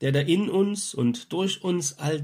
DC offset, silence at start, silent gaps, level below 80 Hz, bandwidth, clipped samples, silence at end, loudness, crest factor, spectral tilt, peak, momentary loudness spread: under 0.1%; 0 s; none; -68 dBFS; 16 kHz; under 0.1%; 0 s; -25 LUFS; 16 dB; -5 dB/octave; -8 dBFS; 5 LU